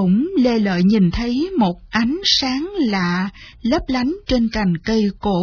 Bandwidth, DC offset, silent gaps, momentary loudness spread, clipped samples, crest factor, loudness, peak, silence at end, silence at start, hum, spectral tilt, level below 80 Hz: 5.4 kHz; under 0.1%; none; 6 LU; under 0.1%; 14 dB; -18 LUFS; -4 dBFS; 0 s; 0 s; none; -6 dB/octave; -36 dBFS